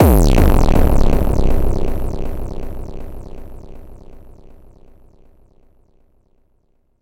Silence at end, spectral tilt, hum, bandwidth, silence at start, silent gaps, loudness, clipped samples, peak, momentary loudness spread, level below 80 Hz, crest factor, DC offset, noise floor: 2.85 s; -7 dB/octave; none; 16.5 kHz; 0 s; none; -18 LUFS; under 0.1%; 0 dBFS; 25 LU; -18 dBFS; 16 dB; under 0.1%; -60 dBFS